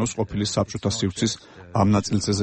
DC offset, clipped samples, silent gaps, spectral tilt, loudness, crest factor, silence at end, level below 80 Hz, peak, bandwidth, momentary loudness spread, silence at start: under 0.1%; under 0.1%; none; -5 dB/octave; -24 LUFS; 16 dB; 0 s; -48 dBFS; -8 dBFS; 8.8 kHz; 6 LU; 0 s